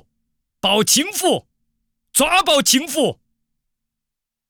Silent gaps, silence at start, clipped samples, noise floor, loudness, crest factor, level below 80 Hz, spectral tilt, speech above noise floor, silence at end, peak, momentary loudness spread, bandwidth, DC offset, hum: none; 0.65 s; under 0.1%; -83 dBFS; -16 LUFS; 18 dB; -54 dBFS; -1.5 dB/octave; 66 dB; 1.35 s; -4 dBFS; 8 LU; over 20 kHz; under 0.1%; none